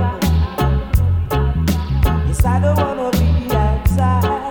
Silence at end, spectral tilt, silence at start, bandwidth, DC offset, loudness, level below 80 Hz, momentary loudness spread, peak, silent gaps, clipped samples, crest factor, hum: 0 s; -7 dB/octave; 0 s; 19 kHz; under 0.1%; -17 LUFS; -20 dBFS; 2 LU; -2 dBFS; none; under 0.1%; 12 dB; none